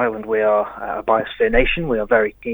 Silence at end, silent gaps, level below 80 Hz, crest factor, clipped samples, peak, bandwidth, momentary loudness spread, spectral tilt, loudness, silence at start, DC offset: 0 s; none; -32 dBFS; 18 dB; under 0.1%; 0 dBFS; over 20 kHz; 4 LU; -8 dB/octave; -19 LUFS; 0 s; under 0.1%